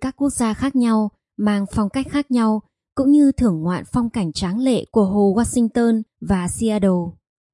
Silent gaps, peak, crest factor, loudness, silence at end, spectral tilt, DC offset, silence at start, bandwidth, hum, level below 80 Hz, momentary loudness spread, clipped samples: none; -6 dBFS; 14 dB; -19 LUFS; 0.4 s; -6 dB/octave; under 0.1%; 0 s; 11.5 kHz; none; -42 dBFS; 7 LU; under 0.1%